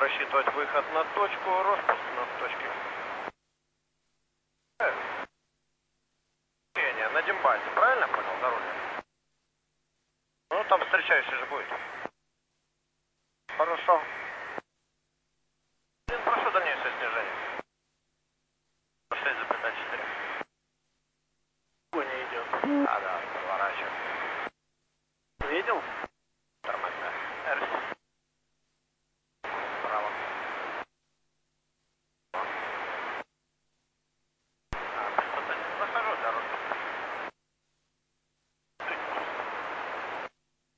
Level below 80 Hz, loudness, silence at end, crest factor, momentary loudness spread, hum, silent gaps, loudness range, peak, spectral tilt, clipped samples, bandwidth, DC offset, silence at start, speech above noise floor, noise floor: -62 dBFS; -30 LUFS; 0.5 s; 24 dB; 14 LU; none; none; 8 LU; -8 dBFS; -4 dB/octave; under 0.1%; 8 kHz; under 0.1%; 0 s; 51 dB; -79 dBFS